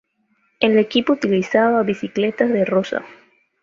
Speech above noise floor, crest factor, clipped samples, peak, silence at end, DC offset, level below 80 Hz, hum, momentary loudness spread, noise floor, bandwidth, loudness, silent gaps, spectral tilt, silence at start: 47 dB; 18 dB; under 0.1%; -2 dBFS; 0.5 s; under 0.1%; -62 dBFS; none; 6 LU; -65 dBFS; 7.4 kHz; -18 LUFS; none; -6 dB/octave; 0.6 s